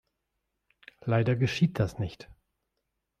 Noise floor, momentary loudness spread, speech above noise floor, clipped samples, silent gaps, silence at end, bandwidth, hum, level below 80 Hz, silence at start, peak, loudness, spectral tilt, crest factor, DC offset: -82 dBFS; 13 LU; 55 dB; under 0.1%; none; 0.95 s; 9.8 kHz; none; -56 dBFS; 1.05 s; -14 dBFS; -29 LUFS; -7 dB/octave; 18 dB; under 0.1%